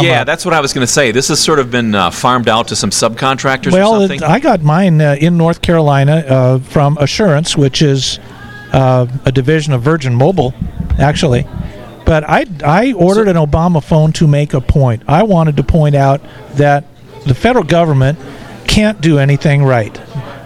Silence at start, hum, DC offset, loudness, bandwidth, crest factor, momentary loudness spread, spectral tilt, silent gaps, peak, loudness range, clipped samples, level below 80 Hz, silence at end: 0 s; none; under 0.1%; -11 LUFS; 14 kHz; 10 dB; 7 LU; -5.5 dB/octave; none; 0 dBFS; 2 LU; under 0.1%; -28 dBFS; 0 s